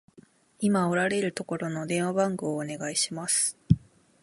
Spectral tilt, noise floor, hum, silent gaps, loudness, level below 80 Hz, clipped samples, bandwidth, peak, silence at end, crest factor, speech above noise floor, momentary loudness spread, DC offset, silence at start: -4.5 dB/octave; -57 dBFS; none; none; -27 LUFS; -52 dBFS; under 0.1%; 11.5 kHz; -6 dBFS; 0.45 s; 22 dB; 30 dB; 7 LU; under 0.1%; 0.6 s